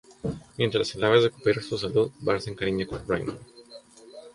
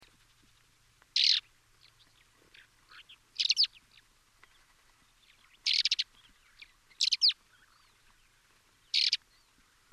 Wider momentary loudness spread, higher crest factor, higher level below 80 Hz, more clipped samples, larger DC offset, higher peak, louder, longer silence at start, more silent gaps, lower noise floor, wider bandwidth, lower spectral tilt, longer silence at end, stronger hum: first, 14 LU vs 10 LU; second, 20 dB vs 26 dB; first, -52 dBFS vs -74 dBFS; neither; neither; first, -6 dBFS vs -10 dBFS; about the same, -26 LUFS vs -28 LUFS; second, 0.1 s vs 1.15 s; neither; second, -49 dBFS vs -66 dBFS; second, 11.5 kHz vs 16 kHz; first, -5.5 dB/octave vs 4 dB/octave; second, 0.05 s vs 0.75 s; neither